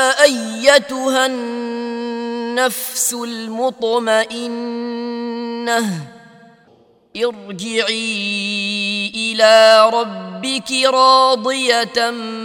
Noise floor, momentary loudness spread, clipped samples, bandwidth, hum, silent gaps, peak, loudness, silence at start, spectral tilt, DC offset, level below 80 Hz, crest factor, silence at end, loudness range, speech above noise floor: -52 dBFS; 14 LU; under 0.1%; 19 kHz; none; none; 0 dBFS; -16 LUFS; 0 s; -2 dB/octave; under 0.1%; -66 dBFS; 16 dB; 0 s; 9 LU; 36 dB